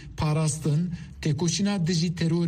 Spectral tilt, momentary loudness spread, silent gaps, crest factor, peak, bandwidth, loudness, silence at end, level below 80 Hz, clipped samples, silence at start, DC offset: -5.5 dB/octave; 5 LU; none; 12 dB; -14 dBFS; 13 kHz; -26 LUFS; 0 s; -48 dBFS; under 0.1%; 0 s; under 0.1%